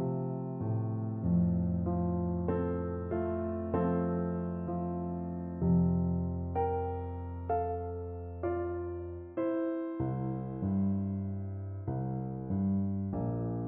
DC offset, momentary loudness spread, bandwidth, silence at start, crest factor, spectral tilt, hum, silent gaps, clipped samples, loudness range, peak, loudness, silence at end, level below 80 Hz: under 0.1%; 8 LU; 2.8 kHz; 0 s; 14 dB; -11.5 dB/octave; none; none; under 0.1%; 3 LU; -18 dBFS; -34 LUFS; 0 s; -50 dBFS